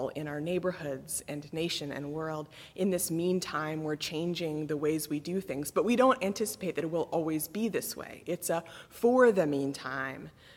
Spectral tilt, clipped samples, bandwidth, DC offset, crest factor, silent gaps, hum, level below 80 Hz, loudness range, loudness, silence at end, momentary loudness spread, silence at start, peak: -4.5 dB/octave; under 0.1%; 17.5 kHz; under 0.1%; 18 dB; none; none; -66 dBFS; 4 LU; -31 LUFS; 0 s; 12 LU; 0 s; -12 dBFS